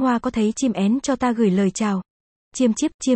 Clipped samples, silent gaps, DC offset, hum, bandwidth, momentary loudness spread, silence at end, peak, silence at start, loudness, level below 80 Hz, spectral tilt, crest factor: under 0.1%; 2.10-2.51 s, 2.94-2.99 s; under 0.1%; none; 8.8 kHz; 5 LU; 0 s; -6 dBFS; 0 s; -21 LUFS; -52 dBFS; -5.5 dB/octave; 14 dB